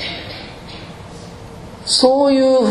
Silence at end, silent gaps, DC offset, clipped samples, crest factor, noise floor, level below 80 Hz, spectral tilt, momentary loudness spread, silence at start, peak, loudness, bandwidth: 0 s; none; under 0.1%; under 0.1%; 18 dB; -34 dBFS; -46 dBFS; -3.5 dB/octave; 22 LU; 0 s; 0 dBFS; -14 LUFS; 11.5 kHz